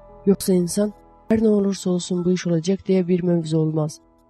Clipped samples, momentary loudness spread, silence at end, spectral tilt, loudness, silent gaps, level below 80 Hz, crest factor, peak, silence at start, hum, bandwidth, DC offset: under 0.1%; 5 LU; 0.35 s; -6.5 dB/octave; -21 LUFS; none; -52 dBFS; 16 dB; -6 dBFS; 0.1 s; none; 13 kHz; under 0.1%